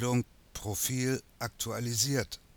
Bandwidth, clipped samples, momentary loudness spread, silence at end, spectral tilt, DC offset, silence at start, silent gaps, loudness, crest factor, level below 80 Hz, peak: over 20 kHz; under 0.1%; 11 LU; 0.2 s; -4 dB/octave; under 0.1%; 0 s; none; -32 LUFS; 18 dB; -56 dBFS; -16 dBFS